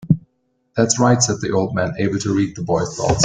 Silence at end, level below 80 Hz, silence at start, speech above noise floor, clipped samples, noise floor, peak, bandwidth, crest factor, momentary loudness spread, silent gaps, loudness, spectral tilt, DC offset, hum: 0 s; -44 dBFS; 0 s; 49 dB; under 0.1%; -67 dBFS; 0 dBFS; 10 kHz; 18 dB; 6 LU; none; -19 LUFS; -5 dB/octave; under 0.1%; none